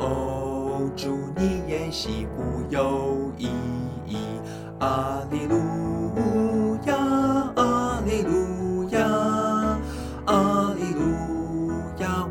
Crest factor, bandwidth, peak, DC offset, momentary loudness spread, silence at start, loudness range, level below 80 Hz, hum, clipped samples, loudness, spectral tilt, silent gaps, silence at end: 18 dB; 18 kHz; -8 dBFS; under 0.1%; 8 LU; 0 s; 4 LU; -40 dBFS; none; under 0.1%; -25 LUFS; -6.5 dB/octave; none; 0 s